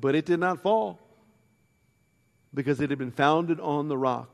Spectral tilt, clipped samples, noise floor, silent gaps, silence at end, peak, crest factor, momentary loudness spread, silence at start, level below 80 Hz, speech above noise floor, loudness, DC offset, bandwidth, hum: -7 dB/octave; under 0.1%; -68 dBFS; none; 0.05 s; -6 dBFS; 20 dB; 7 LU; 0 s; -68 dBFS; 42 dB; -27 LUFS; under 0.1%; 12.5 kHz; none